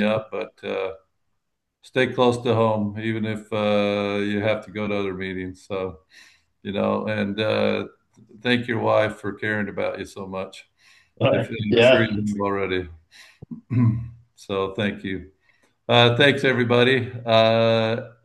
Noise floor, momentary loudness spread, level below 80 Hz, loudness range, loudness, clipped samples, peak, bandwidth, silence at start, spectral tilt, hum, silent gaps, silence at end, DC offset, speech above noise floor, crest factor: -77 dBFS; 15 LU; -60 dBFS; 7 LU; -22 LUFS; under 0.1%; 0 dBFS; 11.5 kHz; 0 s; -6.5 dB/octave; none; none; 0.15 s; under 0.1%; 55 dB; 22 dB